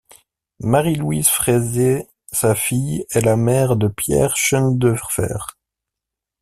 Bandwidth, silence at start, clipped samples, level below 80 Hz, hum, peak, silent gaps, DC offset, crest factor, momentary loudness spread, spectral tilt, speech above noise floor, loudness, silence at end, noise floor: 16 kHz; 0.6 s; under 0.1%; -44 dBFS; none; -2 dBFS; none; under 0.1%; 18 dB; 8 LU; -5 dB/octave; 67 dB; -18 LUFS; 0.9 s; -84 dBFS